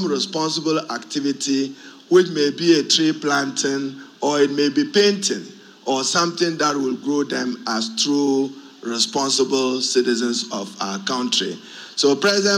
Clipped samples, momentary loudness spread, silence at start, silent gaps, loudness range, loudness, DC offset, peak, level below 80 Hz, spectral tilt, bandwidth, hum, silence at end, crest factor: under 0.1%; 11 LU; 0 s; none; 2 LU; -20 LUFS; under 0.1%; -2 dBFS; -76 dBFS; -3 dB/octave; 15 kHz; none; 0 s; 18 dB